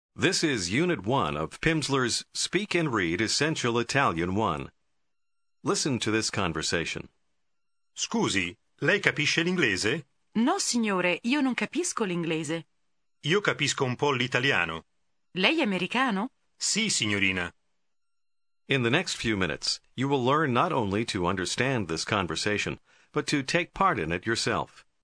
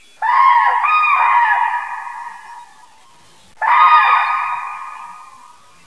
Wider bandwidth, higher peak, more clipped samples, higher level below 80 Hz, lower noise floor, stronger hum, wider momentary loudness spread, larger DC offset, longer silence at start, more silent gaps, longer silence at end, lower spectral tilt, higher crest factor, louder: about the same, 10.5 kHz vs 11 kHz; second, -4 dBFS vs 0 dBFS; neither; first, -56 dBFS vs -70 dBFS; first, under -90 dBFS vs -48 dBFS; neither; second, 8 LU vs 22 LU; second, under 0.1% vs 0.4%; about the same, 0.2 s vs 0.2 s; neither; second, 0.4 s vs 0.6 s; first, -3.5 dB/octave vs 0.5 dB/octave; first, 24 dB vs 16 dB; second, -27 LUFS vs -13 LUFS